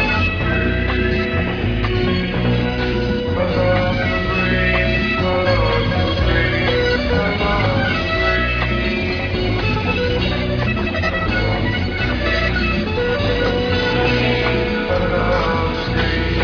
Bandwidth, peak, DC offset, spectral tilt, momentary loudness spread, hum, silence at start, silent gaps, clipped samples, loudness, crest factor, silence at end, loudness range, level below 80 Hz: 5.4 kHz; -4 dBFS; under 0.1%; -7 dB/octave; 3 LU; none; 0 s; none; under 0.1%; -18 LUFS; 14 dB; 0 s; 2 LU; -26 dBFS